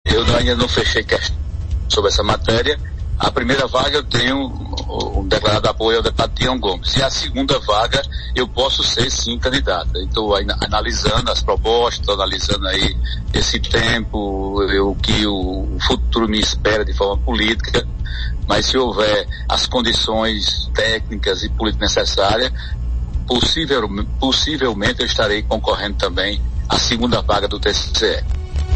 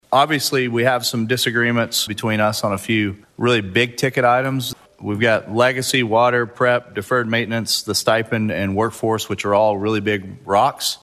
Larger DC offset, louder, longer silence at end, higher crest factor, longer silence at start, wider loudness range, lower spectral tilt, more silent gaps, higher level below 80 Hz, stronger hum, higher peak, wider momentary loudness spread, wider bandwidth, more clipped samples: neither; about the same, -17 LUFS vs -18 LUFS; about the same, 0 s vs 0.05 s; about the same, 16 dB vs 16 dB; about the same, 0.05 s vs 0.1 s; about the same, 1 LU vs 1 LU; about the same, -4 dB/octave vs -4 dB/octave; neither; first, -24 dBFS vs -58 dBFS; neither; about the same, -2 dBFS vs -2 dBFS; about the same, 7 LU vs 6 LU; second, 8.8 kHz vs 14.5 kHz; neither